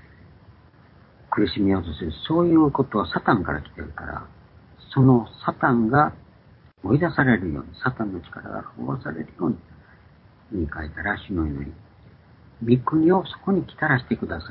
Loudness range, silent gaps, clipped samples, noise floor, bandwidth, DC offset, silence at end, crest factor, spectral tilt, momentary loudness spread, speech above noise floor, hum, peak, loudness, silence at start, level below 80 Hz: 9 LU; none; under 0.1%; -52 dBFS; 5.4 kHz; under 0.1%; 0 s; 20 dB; -12 dB/octave; 15 LU; 30 dB; none; -4 dBFS; -23 LUFS; 1.3 s; -44 dBFS